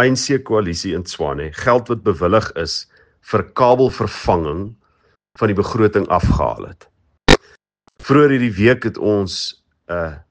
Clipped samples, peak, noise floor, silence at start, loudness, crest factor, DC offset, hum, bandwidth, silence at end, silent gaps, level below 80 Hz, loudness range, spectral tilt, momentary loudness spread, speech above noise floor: under 0.1%; 0 dBFS; -60 dBFS; 0 s; -17 LUFS; 18 dB; under 0.1%; none; 9.8 kHz; 0.1 s; none; -34 dBFS; 3 LU; -5.5 dB/octave; 11 LU; 44 dB